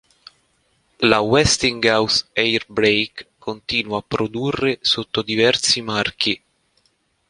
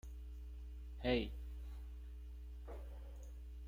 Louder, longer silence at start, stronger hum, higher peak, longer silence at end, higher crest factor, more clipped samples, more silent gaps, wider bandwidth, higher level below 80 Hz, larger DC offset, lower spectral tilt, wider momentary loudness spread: first, -18 LUFS vs -47 LUFS; first, 1 s vs 0.05 s; neither; first, -2 dBFS vs -22 dBFS; first, 0.9 s vs 0 s; about the same, 20 dB vs 24 dB; neither; neither; second, 11.5 kHz vs 16 kHz; about the same, -46 dBFS vs -50 dBFS; neither; second, -3 dB/octave vs -7 dB/octave; second, 9 LU vs 15 LU